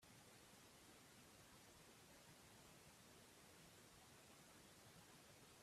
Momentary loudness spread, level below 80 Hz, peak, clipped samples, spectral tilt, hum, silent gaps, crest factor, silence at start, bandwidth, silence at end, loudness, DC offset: 0 LU; -84 dBFS; -54 dBFS; under 0.1%; -3 dB/octave; none; none; 14 dB; 0 s; 15.5 kHz; 0 s; -66 LUFS; under 0.1%